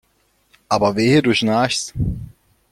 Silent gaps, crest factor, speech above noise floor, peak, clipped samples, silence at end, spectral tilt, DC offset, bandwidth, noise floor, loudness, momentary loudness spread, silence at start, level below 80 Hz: none; 18 dB; 45 dB; -2 dBFS; under 0.1%; 0.45 s; -5 dB/octave; under 0.1%; 15.5 kHz; -62 dBFS; -18 LUFS; 10 LU; 0.7 s; -38 dBFS